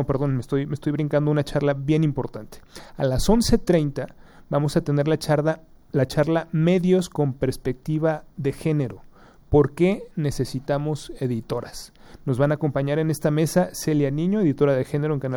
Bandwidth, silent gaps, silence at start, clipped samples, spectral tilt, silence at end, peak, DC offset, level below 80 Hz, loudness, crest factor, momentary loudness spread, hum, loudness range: over 20 kHz; none; 0 s; under 0.1%; -7 dB/octave; 0 s; -4 dBFS; under 0.1%; -40 dBFS; -23 LUFS; 18 dB; 10 LU; none; 3 LU